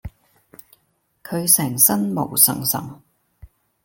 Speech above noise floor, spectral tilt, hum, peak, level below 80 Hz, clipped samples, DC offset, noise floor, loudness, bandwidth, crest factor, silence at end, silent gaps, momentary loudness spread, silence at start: 48 dB; -3 dB/octave; none; 0 dBFS; -52 dBFS; under 0.1%; under 0.1%; -67 dBFS; -16 LUFS; 17 kHz; 22 dB; 0.4 s; none; 12 LU; 0.05 s